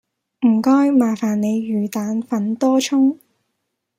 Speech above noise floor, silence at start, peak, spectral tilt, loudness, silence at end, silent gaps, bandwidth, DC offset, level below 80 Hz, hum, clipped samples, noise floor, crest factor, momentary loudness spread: 58 dB; 0.4 s; -4 dBFS; -5.5 dB/octave; -18 LUFS; 0.85 s; none; 15.5 kHz; under 0.1%; -68 dBFS; none; under 0.1%; -75 dBFS; 14 dB; 8 LU